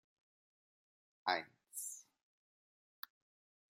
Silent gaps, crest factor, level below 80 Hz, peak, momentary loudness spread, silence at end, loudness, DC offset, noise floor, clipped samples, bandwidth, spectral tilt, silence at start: none; 30 dB; under -90 dBFS; -20 dBFS; 15 LU; 1.7 s; -42 LUFS; under 0.1%; under -90 dBFS; under 0.1%; 16 kHz; -0.5 dB/octave; 1.25 s